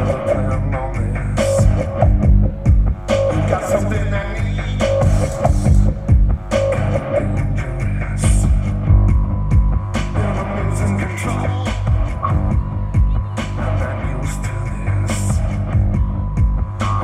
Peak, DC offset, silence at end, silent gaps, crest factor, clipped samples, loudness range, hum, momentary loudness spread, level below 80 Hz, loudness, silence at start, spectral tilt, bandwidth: 0 dBFS; under 0.1%; 0 s; none; 16 dB; under 0.1%; 3 LU; none; 6 LU; -20 dBFS; -18 LUFS; 0 s; -7 dB/octave; 11.5 kHz